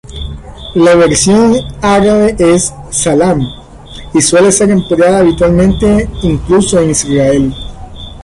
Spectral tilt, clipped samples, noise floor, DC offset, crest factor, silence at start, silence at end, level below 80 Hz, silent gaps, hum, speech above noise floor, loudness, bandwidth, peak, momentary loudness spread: -5 dB/octave; under 0.1%; -29 dBFS; under 0.1%; 10 dB; 0.05 s; 0 s; -26 dBFS; none; none; 21 dB; -9 LUFS; 11.5 kHz; 0 dBFS; 17 LU